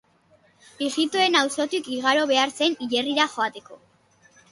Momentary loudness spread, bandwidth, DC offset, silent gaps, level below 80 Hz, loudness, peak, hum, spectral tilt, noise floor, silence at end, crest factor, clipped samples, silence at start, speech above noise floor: 9 LU; 11.5 kHz; under 0.1%; none; -72 dBFS; -22 LUFS; -6 dBFS; none; -1.5 dB/octave; -60 dBFS; 0.75 s; 20 dB; under 0.1%; 0.8 s; 37 dB